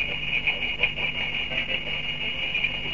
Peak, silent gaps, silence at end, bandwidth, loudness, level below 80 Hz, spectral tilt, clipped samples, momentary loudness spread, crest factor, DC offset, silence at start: -8 dBFS; none; 0 s; 7.6 kHz; -25 LUFS; -44 dBFS; -4 dB/octave; under 0.1%; 3 LU; 20 dB; 1%; 0 s